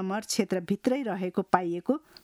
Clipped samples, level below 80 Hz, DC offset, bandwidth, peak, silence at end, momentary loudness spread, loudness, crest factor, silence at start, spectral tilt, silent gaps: under 0.1%; -68 dBFS; under 0.1%; 15.5 kHz; -6 dBFS; 0.25 s; 4 LU; -29 LUFS; 22 dB; 0 s; -5 dB/octave; none